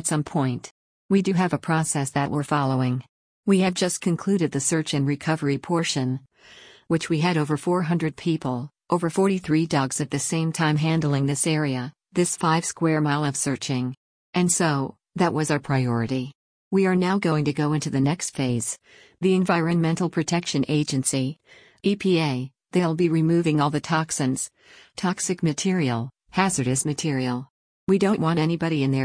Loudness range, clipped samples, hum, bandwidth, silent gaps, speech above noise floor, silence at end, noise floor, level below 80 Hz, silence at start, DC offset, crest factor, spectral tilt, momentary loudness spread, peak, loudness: 2 LU; under 0.1%; none; 10.5 kHz; 0.71-1.09 s, 3.09-3.43 s, 13.97-14.33 s, 16.35-16.71 s, 27.50-27.87 s; 27 dB; 0 s; -49 dBFS; -60 dBFS; 0 s; under 0.1%; 16 dB; -5 dB/octave; 7 LU; -6 dBFS; -24 LUFS